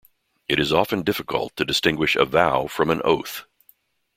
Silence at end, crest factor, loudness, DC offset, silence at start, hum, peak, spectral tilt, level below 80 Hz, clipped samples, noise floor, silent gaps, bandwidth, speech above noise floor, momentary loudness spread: 0.75 s; 22 dB; -21 LUFS; under 0.1%; 0.5 s; none; -2 dBFS; -4.5 dB/octave; -52 dBFS; under 0.1%; -60 dBFS; none; 16.5 kHz; 38 dB; 8 LU